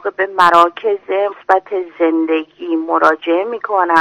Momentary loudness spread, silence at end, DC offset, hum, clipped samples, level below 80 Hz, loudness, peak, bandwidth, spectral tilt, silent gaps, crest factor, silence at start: 9 LU; 0 s; under 0.1%; none; 0.5%; -62 dBFS; -15 LUFS; 0 dBFS; 12 kHz; -4.5 dB/octave; none; 14 dB; 0.05 s